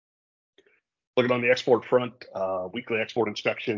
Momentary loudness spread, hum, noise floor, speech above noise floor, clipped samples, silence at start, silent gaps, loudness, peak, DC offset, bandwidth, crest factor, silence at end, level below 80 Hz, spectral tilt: 9 LU; none; -64 dBFS; 39 dB; under 0.1%; 1.15 s; none; -26 LUFS; -8 dBFS; under 0.1%; 7.4 kHz; 20 dB; 0 s; -70 dBFS; -5.5 dB/octave